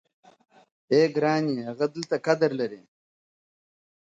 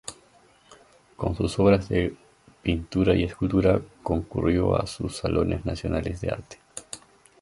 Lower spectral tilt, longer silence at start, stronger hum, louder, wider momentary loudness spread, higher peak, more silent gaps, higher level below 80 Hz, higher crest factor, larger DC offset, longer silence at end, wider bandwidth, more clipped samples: about the same, -6 dB/octave vs -6.5 dB/octave; first, 0.9 s vs 0.05 s; neither; about the same, -25 LUFS vs -25 LUFS; second, 7 LU vs 17 LU; about the same, -8 dBFS vs -6 dBFS; neither; second, -76 dBFS vs -40 dBFS; about the same, 20 dB vs 20 dB; neither; first, 1.25 s vs 0.45 s; second, 7.8 kHz vs 11.5 kHz; neither